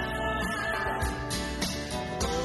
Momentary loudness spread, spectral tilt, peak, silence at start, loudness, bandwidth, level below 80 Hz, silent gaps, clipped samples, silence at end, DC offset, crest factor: 3 LU; -4 dB/octave; -16 dBFS; 0 s; -31 LUFS; 12 kHz; -40 dBFS; none; under 0.1%; 0 s; under 0.1%; 16 dB